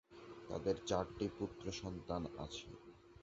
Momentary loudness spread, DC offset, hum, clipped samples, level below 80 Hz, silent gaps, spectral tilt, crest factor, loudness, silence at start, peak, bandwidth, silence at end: 17 LU; under 0.1%; none; under 0.1%; -60 dBFS; none; -5.5 dB/octave; 22 dB; -43 LUFS; 0.1 s; -22 dBFS; 8 kHz; 0 s